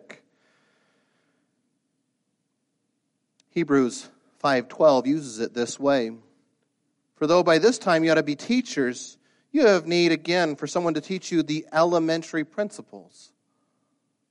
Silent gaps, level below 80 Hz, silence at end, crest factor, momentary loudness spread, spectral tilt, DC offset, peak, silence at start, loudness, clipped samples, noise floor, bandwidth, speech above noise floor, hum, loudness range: none; -72 dBFS; 1.3 s; 18 dB; 11 LU; -5 dB/octave; under 0.1%; -6 dBFS; 0.1 s; -23 LUFS; under 0.1%; -76 dBFS; 11.5 kHz; 53 dB; none; 7 LU